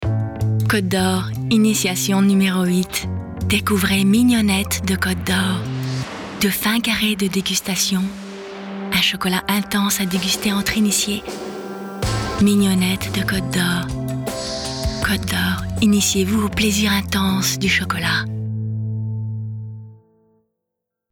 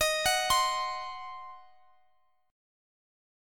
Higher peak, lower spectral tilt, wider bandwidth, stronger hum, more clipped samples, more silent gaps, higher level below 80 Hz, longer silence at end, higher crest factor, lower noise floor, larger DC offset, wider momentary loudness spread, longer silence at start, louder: first, -6 dBFS vs -12 dBFS; first, -4 dB/octave vs 0.5 dB/octave; first, 20 kHz vs 17.5 kHz; neither; neither; neither; first, -38 dBFS vs -58 dBFS; second, 1.15 s vs 1.9 s; second, 12 dB vs 20 dB; first, -81 dBFS vs -72 dBFS; neither; second, 11 LU vs 19 LU; about the same, 0 s vs 0 s; first, -19 LUFS vs -28 LUFS